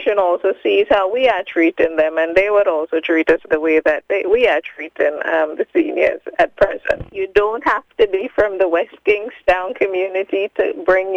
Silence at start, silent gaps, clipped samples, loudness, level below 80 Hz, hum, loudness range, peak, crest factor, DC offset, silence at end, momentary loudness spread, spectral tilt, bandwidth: 0 s; none; under 0.1%; -17 LUFS; -46 dBFS; none; 2 LU; -2 dBFS; 16 dB; under 0.1%; 0 s; 5 LU; -5.5 dB/octave; 7.8 kHz